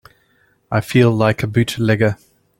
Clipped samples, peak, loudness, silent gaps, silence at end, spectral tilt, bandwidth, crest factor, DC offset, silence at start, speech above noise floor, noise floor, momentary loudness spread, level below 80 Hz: under 0.1%; -2 dBFS; -17 LUFS; none; 0.45 s; -6.5 dB/octave; 16.5 kHz; 16 dB; under 0.1%; 0.7 s; 43 dB; -59 dBFS; 8 LU; -48 dBFS